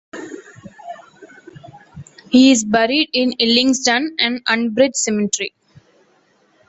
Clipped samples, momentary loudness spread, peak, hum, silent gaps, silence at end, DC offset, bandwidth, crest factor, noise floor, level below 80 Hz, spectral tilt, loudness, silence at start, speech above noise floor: under 0.1%; 23 LU; 0 dBFS; none; none; 1.2 s; under 0.1%; 8.2 kHz; 18 dB; -57 dBFS; -58 dBFS; -2.5 dB/octave; -15 LUFS; 0.15 s; 42 dB